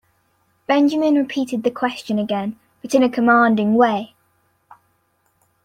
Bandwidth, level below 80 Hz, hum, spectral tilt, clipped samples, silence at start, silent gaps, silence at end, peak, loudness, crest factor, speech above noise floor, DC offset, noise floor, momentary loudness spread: 14 kHz; -64 dBFS; none; -5.5 dB/octave; under 0.1%; 0.7 s; none; 1.6 s; -2 dBFS; -18 LUFS; 16 dB; 48 dB; under 0.1%; -65 dBFS; 13 LU